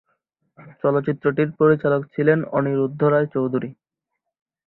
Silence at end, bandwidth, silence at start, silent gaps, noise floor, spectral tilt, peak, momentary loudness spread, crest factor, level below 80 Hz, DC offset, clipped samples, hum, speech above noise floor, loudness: 0.95 s; 4.1 kHz; 0.6 s; none; -81 dBFS; -12 dB/octave; -4 dBFS; 7 LU; 18 dB; -62 dBFS; under 0.1%; under 0.1%; none; 61 dB; -20 LUFS